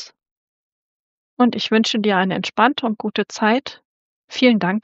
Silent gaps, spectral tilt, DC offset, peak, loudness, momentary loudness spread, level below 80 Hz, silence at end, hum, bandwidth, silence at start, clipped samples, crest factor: 0.31-1.37 s, 3.85-4.28 s; -3 dB/octave; under 0.1%; -2 dBFS; -18 LUFS; 7 LU; -70 dBFS; 0.05 s; none; 8 kHz; 0 s; under 0.1%; 18 dB